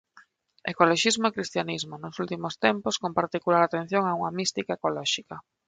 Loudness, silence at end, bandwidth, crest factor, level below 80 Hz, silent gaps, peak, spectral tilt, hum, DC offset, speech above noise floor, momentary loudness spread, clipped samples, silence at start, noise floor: -26 LUFS; 0.25 s; 9.6 kHz; 22 dB; -68 dBFS; none; -6 dBFS; -3.5 dB/octave; none; under 0.1%; 32 dB; 11 LU; under 0.1%; 0.15 s; -58 dBFS